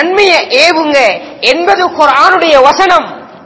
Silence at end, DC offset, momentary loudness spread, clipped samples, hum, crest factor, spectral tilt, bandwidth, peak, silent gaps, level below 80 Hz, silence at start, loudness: 0.1 s; under 0.1%; 5 LU; 5%; none; 8 dB; -2 dB/octave; 8 kHz; 0 dBFS; none; -46 dBFS; 0 s; -7 LUFS